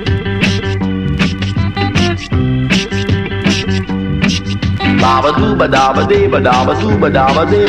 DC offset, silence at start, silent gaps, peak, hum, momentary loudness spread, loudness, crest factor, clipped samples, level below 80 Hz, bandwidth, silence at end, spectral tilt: under 0.1%; 0 s; none; 0 dBFS; none; 6 LU; -13 LUFS; 12 dB; under 0.1%; -28 dBFS; 9.8 kHz; 0 s; -6 dB/octave